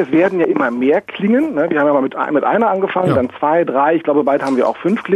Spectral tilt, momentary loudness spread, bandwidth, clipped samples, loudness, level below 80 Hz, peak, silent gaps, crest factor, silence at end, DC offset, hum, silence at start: -8 dB/octave; 3 LU; 10.5 kHz; under 0.1%; -15 LUFS; -58 dBFS; -2 dBFS; none; 12 dB; 0 s; under 0.1%; none; 0 s